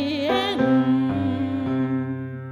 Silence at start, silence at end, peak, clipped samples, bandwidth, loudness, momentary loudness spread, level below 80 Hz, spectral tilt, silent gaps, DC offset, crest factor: 0 s; 0 s; -10 dBFS; under 0.1%; 10.5 kHz; -23 LUFS; 7 LU; -56 dBFS; -7.5 dB/octave; none; under 0.1%; 12 dB